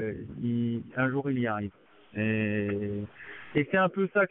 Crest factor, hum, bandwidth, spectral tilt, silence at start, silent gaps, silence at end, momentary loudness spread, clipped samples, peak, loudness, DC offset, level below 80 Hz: 18 dB; none; 3.9 kHz; -6 dB/octave; 0 s; none; 0.05 s; 12 LU; under 0.1%; -10 dBFS; -30 LUFS; under 0.1%; -64 dBFS